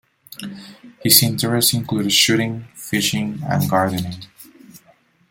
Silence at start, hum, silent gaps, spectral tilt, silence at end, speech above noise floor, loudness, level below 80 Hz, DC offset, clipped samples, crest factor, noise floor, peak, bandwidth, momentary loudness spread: 0.3 s; none; none; -3 dB/octave; 0.55 s; 37 dB; -17 LUFS; -56 dBFS; under 0.1%; under 0.1%; 20 dB; -56 dBFS; 0 dBFS; 17 kHz; 22 LU